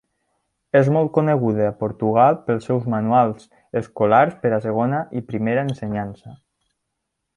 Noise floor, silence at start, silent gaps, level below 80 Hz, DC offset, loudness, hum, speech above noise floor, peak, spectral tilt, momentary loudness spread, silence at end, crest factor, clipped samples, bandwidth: -78 dBFS; 0.75 s; none; -56 dBFS; under 0.1%; -20 LUFS; none; 59 dB; -2 dBFS; -9 dB/octave; 11 LU; 1 s; 18 dB; under 0.1%; 10.5 kHz